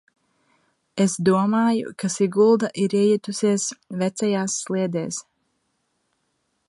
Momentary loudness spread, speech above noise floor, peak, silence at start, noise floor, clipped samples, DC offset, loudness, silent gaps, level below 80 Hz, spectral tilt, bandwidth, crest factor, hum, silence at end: 9 LU; 51 dB; -6 dBFS; 0.95 s; -72 dBFS; under 0.1%; under 0.1%; -22 LUFS; none; -70 dBFS; -5 dB/octave; 11.5 kHz; 16 dB; none; 1.45 s